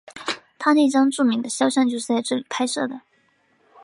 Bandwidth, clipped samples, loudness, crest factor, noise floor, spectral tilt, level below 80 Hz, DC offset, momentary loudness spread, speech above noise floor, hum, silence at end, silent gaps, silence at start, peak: 11.5 kHz; under 0.1%; -21 LUFS; 16 dB; -63 dBFS; -3 dB/octave; -74 dBFS; under 0.1%; 12 LU; 43 dB; none; 0.85 s; none; 0.05 s; -6 dBFS